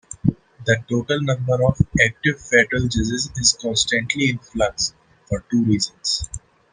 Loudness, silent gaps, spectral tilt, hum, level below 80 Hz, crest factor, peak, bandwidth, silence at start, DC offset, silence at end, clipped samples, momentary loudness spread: -20 LUFS; none; -4 dB/octave; none; -40 dBFS; 20 dB; -2 dBFS; 10 kHz; 0.1 s; under 0.1%; 0.35 s; under 0.1%; 7 LU